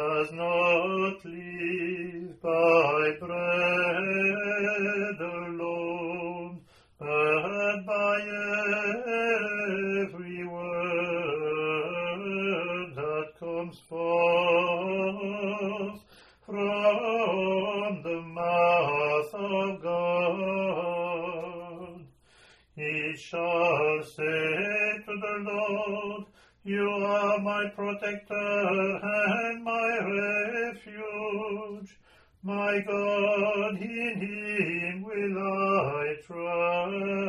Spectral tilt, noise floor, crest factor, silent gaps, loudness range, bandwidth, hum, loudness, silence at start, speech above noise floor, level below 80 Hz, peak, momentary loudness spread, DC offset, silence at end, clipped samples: -6 dB/octave; -60 dBFS; 18 dB; none; 4 LU; 11 kHz; none; -28 LUFS; 0 s; 33 dB; -68 dBFS; -10 dBFS; 11 LU; under 0.1%; 0 s; under 0.1%